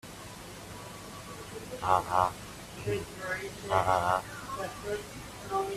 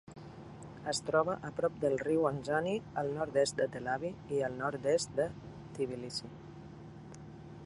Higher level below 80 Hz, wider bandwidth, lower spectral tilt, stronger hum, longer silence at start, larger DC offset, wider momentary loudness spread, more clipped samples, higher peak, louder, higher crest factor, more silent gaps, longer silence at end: first, -56 dBFS vs -64 dBFS; first, 15.5 kHz vs 11.5 kHz; about the same, -4.5 dB/octave vs -4.5 dB/octave; neither; about the same, 0.05 s vs 0.05 s; neither; about the same, 17 LU vs 19 LU; neither; first, -10 dBFS vs -14 dBFS; about the same, -32 LUFS vs -34 LUFS; about the same, 24 dB vs 20 dB; neither; about the same, 0 s vs 0 s